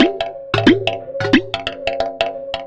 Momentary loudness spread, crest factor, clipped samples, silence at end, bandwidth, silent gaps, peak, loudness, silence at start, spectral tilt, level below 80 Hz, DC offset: 9 LU; 16 dB; under 0.1%; 0 s; 8.8 kHz; none; 0 dBFS; -18 LUFS; 0 s; -6 dB/octave; -42 dBFS; under 0.1%